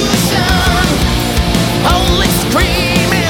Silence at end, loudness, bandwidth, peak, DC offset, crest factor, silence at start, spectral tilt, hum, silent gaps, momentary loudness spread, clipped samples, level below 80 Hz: 0 s; -12 LUFS; 17.5 kHz; 0 dBFS; under 0.1%; 12 dB; 0 s; -4 dB/octave; none; none; 2 LU; under 0.1%; -20 dBFS